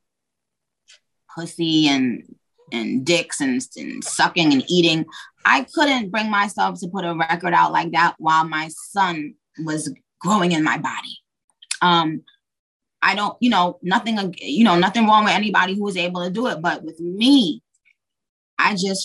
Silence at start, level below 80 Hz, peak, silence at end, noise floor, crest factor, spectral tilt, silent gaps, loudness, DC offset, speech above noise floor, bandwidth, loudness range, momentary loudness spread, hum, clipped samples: 1.3 s; -70 dBFS; -2 dBFS; 0 s; -82 dBFS; 18 dB; -4 dB/octave; 11.44-11.48 s, 12.59-12.80 s, 18.29-18.57 s; -19 LUFS; under 0.1%; 63 dB; 12.5 kHz; 4 LU; 14 LU; none; under 0.1%